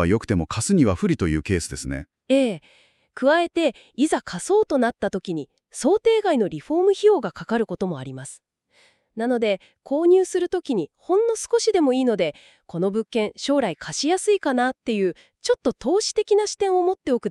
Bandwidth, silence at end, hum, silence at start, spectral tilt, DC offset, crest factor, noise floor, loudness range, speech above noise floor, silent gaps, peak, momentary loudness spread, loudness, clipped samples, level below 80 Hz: 12.5 kHz; 0 s; none; 0 s; -5 dB/octave; under 0.1%; 16 dB; -60 dBFS; 3 LU; 39 dB; none; -6 dBFS; 10 LU; -22 LUFS; under 0.1%; -48 dBFS